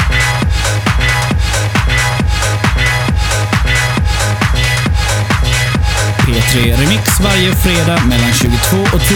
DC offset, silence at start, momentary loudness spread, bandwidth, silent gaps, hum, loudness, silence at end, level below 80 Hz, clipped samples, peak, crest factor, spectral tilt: under 0.1%; 0 s; 3 LU; 20 kHz; none; none; -12 LUFS; 0 s; -18 dBFS; under 0.1%; 0 dBFS; 10 dB; -4 dB/octave